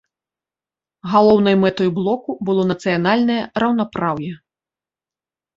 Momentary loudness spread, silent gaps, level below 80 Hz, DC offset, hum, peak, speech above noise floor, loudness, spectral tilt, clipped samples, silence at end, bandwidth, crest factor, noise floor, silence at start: 9 LU; none; -56 dBFS; under 0.1%; none; -2 dBFS; over 73 dB; -17 LUFS; -7.5 dB/octave; under 0.1%; 1.2 s; 7.6 kHz; 18 dB; under -90 dBFS; 1.05 s